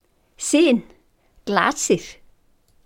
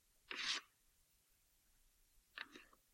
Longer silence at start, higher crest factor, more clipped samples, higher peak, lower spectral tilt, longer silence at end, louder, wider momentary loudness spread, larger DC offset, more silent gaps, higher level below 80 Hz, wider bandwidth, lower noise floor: about the same, 0.4 s vs 0.3 s; about the same, 22 dB vs 26 dB; neither; first, -2 dBFS vs -28 dBFS; first, -3.5 dB/octave vs 1 dB/octave; first, 0.75 s vs 0.3 s; first, -20 LUFS vs -46 LUFS; about the same, 15 LU vs 16 LU; neither; neither; first, -56 dBFS vs -80 dBFS; about the same, 17 kHz vs 16 kHz; second, -58 dBFS vs -77 dBFS